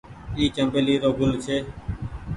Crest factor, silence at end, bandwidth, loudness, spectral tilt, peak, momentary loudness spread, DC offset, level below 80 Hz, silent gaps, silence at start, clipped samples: 16 dB; 0 s; 11.5 kHz; -24 LUFS; -6 dB/octave; -8 dBFS; 13 LU; under 0.1%; -40 dBFS; none; 0.05 s; under 0.1%